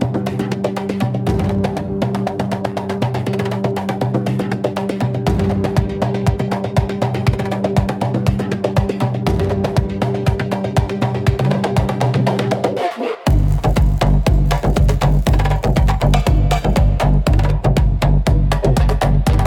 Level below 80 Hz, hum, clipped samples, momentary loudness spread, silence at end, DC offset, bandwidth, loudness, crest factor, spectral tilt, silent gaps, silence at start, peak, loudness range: -20 dBFS; none; under 0.1%; 5 LU; 0 s; under 0.1%; 16 kHz; -17 LUFS; 14 dB; -7 dB/octave; none; 0 s; -2 dBFS; 4 LU